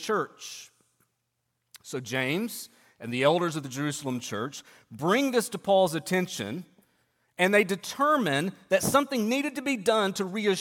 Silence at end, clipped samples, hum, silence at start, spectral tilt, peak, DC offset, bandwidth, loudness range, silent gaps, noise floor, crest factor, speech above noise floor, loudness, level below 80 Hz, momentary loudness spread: 0 s; under 0.1%; none; 0 s; -4 dB/octave; -8 dBFS; under 0.1%; 17.5 kHz; 5 LU; none; -79 dBFS; 20 dB; 52 dB; -27 LUFS; -70 dBFS; 15 LU